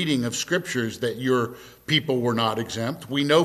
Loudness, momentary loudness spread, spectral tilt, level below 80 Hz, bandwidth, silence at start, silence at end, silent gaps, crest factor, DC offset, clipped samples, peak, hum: -25 LUFS; 7 LU; -4.5 dB/octave; -60 dBFS; 14.5 kHz; 0 s; 0 s; none; 18 dB; under 0.1%; under 0.1%; -6 dBFS; none